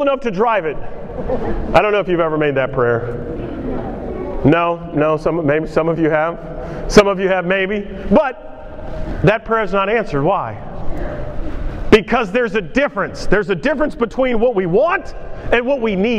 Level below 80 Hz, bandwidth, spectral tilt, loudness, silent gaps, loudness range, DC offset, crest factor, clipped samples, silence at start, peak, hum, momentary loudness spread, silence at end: -30 dBFS; 11.5 kHz; -6.5 dB/octave; -17 LUFS; none; 2 LU; under 0.1%; 16 dB; under 0.1%; 0 s; 0 dBFS; none; 14 LU; 0 s